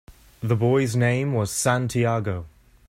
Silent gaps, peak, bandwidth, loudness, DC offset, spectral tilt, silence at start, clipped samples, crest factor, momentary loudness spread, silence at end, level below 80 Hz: none; -6 dBFS; 14.5 kHz; -23 LUFS; under 0.1%; -5.5 dB/octave; 0.1 s; under 0.1%; 18 dB; 9 LU; 0.4 s; -52 dBFS